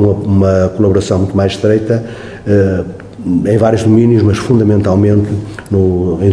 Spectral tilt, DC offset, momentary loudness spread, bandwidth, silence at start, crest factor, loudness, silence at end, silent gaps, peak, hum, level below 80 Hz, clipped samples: -8 dB/octave; 0.1%; 9 LU; 11 kHz; 0 s; 10 dB; -12 LUFS; 0 s; none; 0 dBFS; none; -38 dBFS; 0.3%